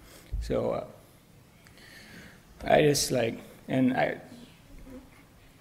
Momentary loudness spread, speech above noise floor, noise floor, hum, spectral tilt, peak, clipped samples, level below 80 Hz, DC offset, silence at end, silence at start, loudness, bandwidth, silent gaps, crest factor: 26 LU; 30 dB; -56 dBFS; none; -4.5 dB/octave; -8 dBFS; under 0.1%; -46 dBFS; under 0.1%; 0.6 s; 0.1 s; -27 LUFS; 16 kHz; none; 24 dB